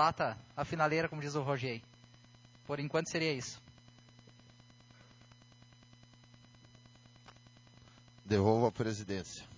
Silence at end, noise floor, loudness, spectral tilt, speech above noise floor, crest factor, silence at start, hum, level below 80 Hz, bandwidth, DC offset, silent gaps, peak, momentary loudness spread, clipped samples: 0 s; -61 dBFS; -35 LUFS; -5.5 dB/octave; 27 dB; 22 dB; 0 s; none; -64 dBFS; 7.6 kHz; under 0.1%; none; -16 dBFS; 14 LU; under 0.1%